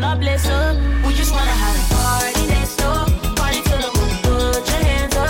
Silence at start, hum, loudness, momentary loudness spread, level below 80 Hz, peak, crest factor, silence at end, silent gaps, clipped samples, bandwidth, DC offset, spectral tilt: 0 s; none; -18 LUFS; 2 LU; -18 dBFS; -6 dBFS; 10 dB; 0 s; none; under 0.1%; 17 kHz; under 0.1%; -4.5 dB/octave